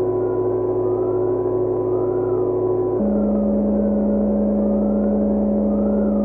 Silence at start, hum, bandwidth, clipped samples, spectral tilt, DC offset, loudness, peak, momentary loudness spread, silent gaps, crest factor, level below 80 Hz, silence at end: 0 s; none; 2.2 kHz; under 0.1%; -13.5 dB/octave; under 0.1%; -20 LUFS; -8 dBFS; 2 LU; none; 10 dB; -38 dBFS; 0 s